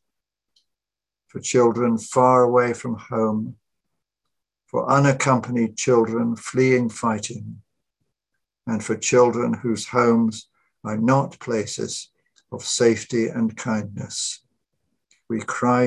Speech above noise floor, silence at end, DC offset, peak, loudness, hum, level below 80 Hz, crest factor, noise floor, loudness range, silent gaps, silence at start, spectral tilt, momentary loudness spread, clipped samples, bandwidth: 69 dB; 0 s; under 0.1%; -4 dBFS; -21 LUFS; none; -62 dBFS; 18 dB; -90 dBFS; 4 LU; none; 1.35 s; -5 dB/octave; 14 LU; under 0.1%; 11.5 kHz